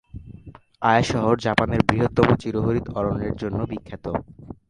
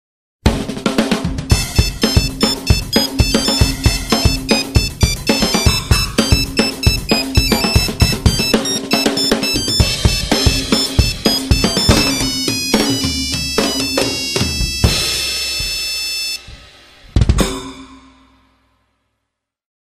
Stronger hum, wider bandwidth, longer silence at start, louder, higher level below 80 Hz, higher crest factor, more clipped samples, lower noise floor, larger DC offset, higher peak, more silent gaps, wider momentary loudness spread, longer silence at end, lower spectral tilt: neither; second, 11 kHz vs 15.5 kHz; second, 0.15 s vs 0.45 s; second, -22 LUFS vs -15 LUFS; second, -40 dBFS vs -22 dBFS; first, 22 dB vs 16 dB; neither; second, -45 dBFS vs -76 dBFS; neither; about the same, 0 dBFS vs 0 dBFS; neither; first, 12 LU vs 4 LU; second, 0.15 s vs 1.85 s; first, -6.5 dB/octave vs -4 dB/octave